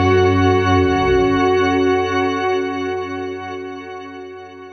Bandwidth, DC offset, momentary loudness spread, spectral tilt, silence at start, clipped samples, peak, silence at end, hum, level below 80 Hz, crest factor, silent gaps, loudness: 6.4 kHz; under 0.1%; 17 LU; -6.5 dB/octave; 0 s; under 0.1%; -2 dBFS; 0 s; none; -40 dBFS; 14 dB; none; -17 LUFS